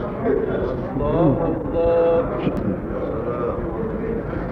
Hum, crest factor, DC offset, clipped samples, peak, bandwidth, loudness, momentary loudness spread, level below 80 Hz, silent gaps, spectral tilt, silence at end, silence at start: none; 16 dB; under 0.1%; under 0.1%; -6 dBFS; 5.2 kHz; -22 LUFS; 8 LU; -34 dBFS; none; -10.5 dB/octave; 0 s; 0 s